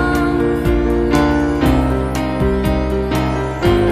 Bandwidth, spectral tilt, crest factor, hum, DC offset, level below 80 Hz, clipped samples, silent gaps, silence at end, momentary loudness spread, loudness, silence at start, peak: 14 kHz; -7 dB/octave; 14 dB; none; under 0.1%; -22 dBFS; under 0.1%; none; 0 s; 4 LU; -16 LUFS; 0 s; -2 dBFS